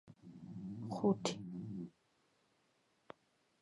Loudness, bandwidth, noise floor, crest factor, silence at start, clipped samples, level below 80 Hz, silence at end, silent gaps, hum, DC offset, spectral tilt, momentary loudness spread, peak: -41 LUFS; 11 kHz; -77 dBFS; 24 dB; 0.05 s; under 0.1%; -78 dBFS; 1.75 s; none; none; under 0.1%; -6 dB/octave; 25 LU; -20 dBFS